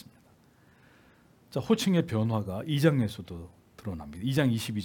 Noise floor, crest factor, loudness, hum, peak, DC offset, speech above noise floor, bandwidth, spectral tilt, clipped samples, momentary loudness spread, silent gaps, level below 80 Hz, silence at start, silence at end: -61 dBFS; 22 dB; -29 LUFS; none; -8 dBFS; under 0.1%; 33 dB; 18 kHz; -6.5 dB/octave; under 0.1%; 17 LU; none; -62 dBFS; 1.5 s; 0 s